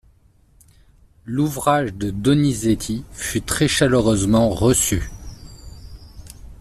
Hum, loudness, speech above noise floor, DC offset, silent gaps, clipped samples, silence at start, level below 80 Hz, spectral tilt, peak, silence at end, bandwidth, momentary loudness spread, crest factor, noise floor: none; -19 LUFS; 36 dB; under 0.1%; none; under 0.1%; 1.25 s; -38 dBFS; -5 dB/octave; -4 dBFS; 0.05 s; 14.5 kHz; 20 LU; 18 dB; -55 dBFS